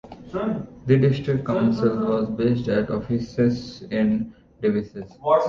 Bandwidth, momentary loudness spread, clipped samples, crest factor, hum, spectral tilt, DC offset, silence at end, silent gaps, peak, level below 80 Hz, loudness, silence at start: 7.2 kHz; 10 LU; under 0.1%; 16 dB; none; -8.5 dB/octave; under 0.1%; 0 s; none; -6 dBFS; -50 dBFS; -23 LUFS; 0.05 s